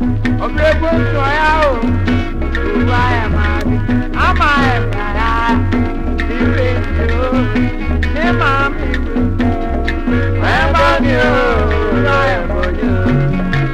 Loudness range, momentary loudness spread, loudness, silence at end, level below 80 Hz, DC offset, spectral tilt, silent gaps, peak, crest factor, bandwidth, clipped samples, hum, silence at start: 2 LU; 6 LU; -14 LUFS; 0 s; -18 dBFS; under 0.1%; -7.5 dB/octave; none; 0 dBFS; 12 dB; 9.2 kHz; under 0.1%; none; 0 s